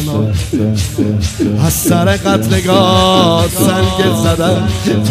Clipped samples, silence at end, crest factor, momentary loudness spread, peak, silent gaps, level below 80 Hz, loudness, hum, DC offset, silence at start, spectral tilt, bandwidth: under 0.1%; 0 s; 12 dB; 6 LU; 0 dBFS; none; -30 dBFS; -12 LUFS; none; under 0.1%; 0 s; -5 dB/octave; 16 kHz